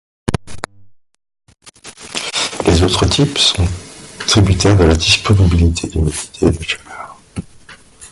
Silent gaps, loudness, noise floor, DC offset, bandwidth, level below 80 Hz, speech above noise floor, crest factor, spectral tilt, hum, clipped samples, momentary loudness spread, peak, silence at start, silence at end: none; -14 LUFS; -44 dBFS; under 0.1%; 11.5 kHz; -24 dBFS; 32 dB; 16 dB; -4.5 dB/octave; none; under 0.1%; 20 LU; 0 dBFS; 0.25 s; 0.05 s